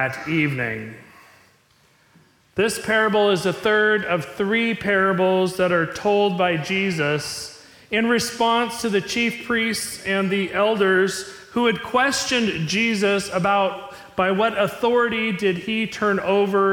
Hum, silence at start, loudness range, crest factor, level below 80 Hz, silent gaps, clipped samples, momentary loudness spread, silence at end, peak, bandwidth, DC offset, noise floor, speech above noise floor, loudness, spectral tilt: none; 0 s; 2 LU; 14 dB; -58 dBFS; none; under 0.1%; 7 LU; 0 s; -8 dBFS; 18 kHz; under 0.1%; -58 dBFS; 38 dB; -21 LUFS; -4.5 dB/octave